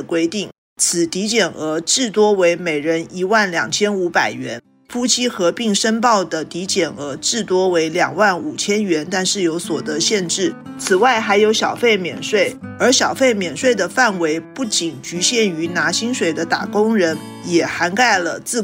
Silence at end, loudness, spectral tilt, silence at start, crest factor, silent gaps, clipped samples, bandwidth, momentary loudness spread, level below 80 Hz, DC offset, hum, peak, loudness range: 0 s; -17 LUFS; -3 dB/octave; 0 s; 14 dB; 0.58-0.76 s; under 0.1%; 16 kHz; 7 LU; -60 dBFS; under 0.1%; none; -2 dBFS; 2 LU